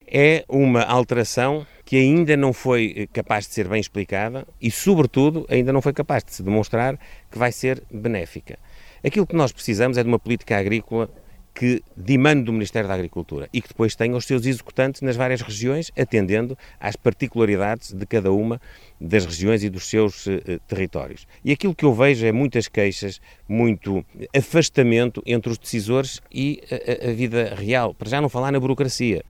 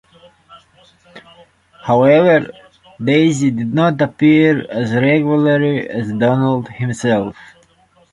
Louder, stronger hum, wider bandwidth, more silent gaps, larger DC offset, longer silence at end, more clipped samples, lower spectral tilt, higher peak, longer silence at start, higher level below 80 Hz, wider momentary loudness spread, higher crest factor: second, -21 LUFS vs -14 LUFS; neither; first, 16.5 kHz vs 11 kHz; neither; neither; second, 0.1 s vs 0.8 s; neither; about the same, -6 dB/octave vs -7 dB/octave; about the same, -2 dBFS vs -2 dBFS; second, 0.1 s vs 0.5 s; first, -48 dBFS vs -54 dBFS; about the same, 11 LU vs 10 LU; first, 20 dB vs 14 dB